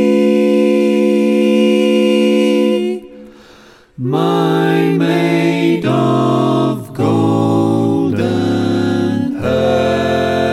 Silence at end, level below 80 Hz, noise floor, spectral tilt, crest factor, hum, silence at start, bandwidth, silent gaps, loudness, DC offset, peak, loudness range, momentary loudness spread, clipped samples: 0 s; -50 dBFS; -43 dBFS; -7 dB/octave; 12 dB; none; 0 s; 14.5 kHz; none; -13 LUFS; under 0.1%; 0 dBFS; 2 LU; 5 LU; under 0.1%